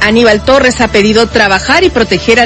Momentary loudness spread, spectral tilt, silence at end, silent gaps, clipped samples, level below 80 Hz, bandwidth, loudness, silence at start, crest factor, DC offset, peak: 2 LU; -4 dB/octave; 0 s; none; 2%; -28 dBFS; 11 kHz; -7 LUFS; 0 s; 8 dB; under 0.1%; 0 dBFS